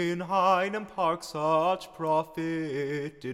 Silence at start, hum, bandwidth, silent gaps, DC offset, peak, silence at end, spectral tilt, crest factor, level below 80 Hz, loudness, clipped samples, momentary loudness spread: 0 s; none; 15.5 kHz; none; under 0.1%; -12 dBFS; 0 s; -5.5 dB/octave; 16 dB; -66 dBFS; -28 LUFS; under 0.1%; 8 LU